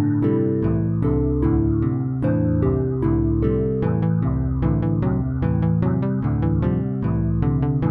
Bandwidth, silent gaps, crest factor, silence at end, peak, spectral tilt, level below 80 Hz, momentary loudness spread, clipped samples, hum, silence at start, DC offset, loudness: 3.7 kHz; none; 12 dB; 0 s; -8 dBFS; -13 dB/octave; -30 dBFS; 2 LU; under 0.1%; none; 0 s; under 0.1%; -21 LUFS